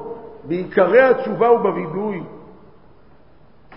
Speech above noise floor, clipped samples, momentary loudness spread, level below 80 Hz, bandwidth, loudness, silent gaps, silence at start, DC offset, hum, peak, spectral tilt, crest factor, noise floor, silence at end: 35 dB; under 0.1%; 20 LU; -56 dBFS; 5.6 kHz; -17 LUFS; none; 0 s; 0.4%; none; -2 dBFS; -11.5 dB/octave; 18 dB; -51 dBFS; 0 s